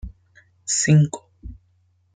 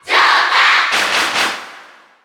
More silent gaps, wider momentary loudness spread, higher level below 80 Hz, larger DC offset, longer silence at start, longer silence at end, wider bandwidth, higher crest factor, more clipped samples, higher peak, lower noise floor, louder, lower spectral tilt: neither; first, 21 LU vs 8 LU; first, -44 dBFS vs -62 dBFS; neither; about the same, 0.05 s vs 0.05 s; first, 0.6 s vs 0.4 s; second, 9.6 kHz vs 19 kHz; about the same, 18 dB vs 14 dB; neither; second, -6 dBFS vs -2 dBFS; first, -62 dBFS vs -41 dBFS; second, -19 LUFS vs -12 LUFS; first, -4.5 dB/octave vs 0.5 dB/octave